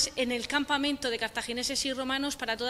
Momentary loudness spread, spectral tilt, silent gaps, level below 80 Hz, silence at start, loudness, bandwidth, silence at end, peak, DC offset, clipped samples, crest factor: 4 LU; -1.5 dB/octave; none; -56 dBFS; 0 s; -30 LUFS; 16 kHz; 0 s; -12 dBFS; under 0.1%; under 0.1%; 18 dB